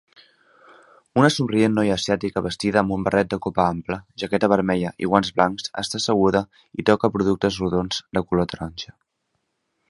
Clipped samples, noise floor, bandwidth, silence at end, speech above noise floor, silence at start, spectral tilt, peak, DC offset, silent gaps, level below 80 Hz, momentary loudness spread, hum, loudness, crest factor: under 0.1%; -74 dBFS; 11.5 kHz; 1.05 s; 53 dB; 1.15 s; -5.5 dB/octave; 0 dBFS; under 0.1%; none; -48 dBFS; 9 LU; none; -22 LUFS; 22 dB